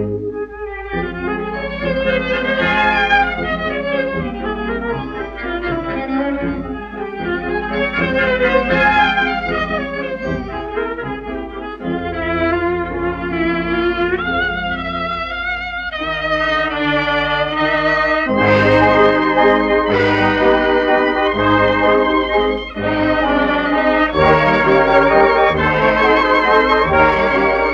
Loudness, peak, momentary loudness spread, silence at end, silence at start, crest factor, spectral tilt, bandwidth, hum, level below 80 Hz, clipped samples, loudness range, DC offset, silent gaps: -16 LUFS; 0 dBFS; 11 LU; 0 s; 0 s; 16 dB; -7 dB/octave; 7.6 kHz; none; -34 dBFS; under 0.1%; 8 LU; under 0.1%; none